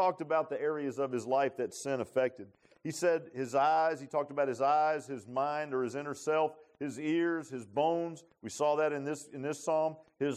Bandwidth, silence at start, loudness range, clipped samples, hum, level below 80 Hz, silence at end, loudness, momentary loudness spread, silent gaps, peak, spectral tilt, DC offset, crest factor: 14.5 kHz; 0 s; 2 LU; under 0.1%; none; -82 dBFS; 0 s; -33 LUFS; 10 LU; none; -18 dBFS; -5 dB/octave; under 0.1%; 16 dB